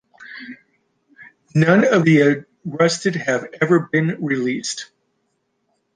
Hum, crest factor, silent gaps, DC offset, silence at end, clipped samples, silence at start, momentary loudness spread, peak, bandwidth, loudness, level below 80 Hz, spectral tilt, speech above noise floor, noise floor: none; 18 dB; none; under 0.1%; 1.1 s; under 0.1%; 0.2 s; 22 LU; -2 dBFS; 9.8 kHz; -18 LUFS; -64 dBFS; -6 dB/octave; 53 dB; -70 dBFS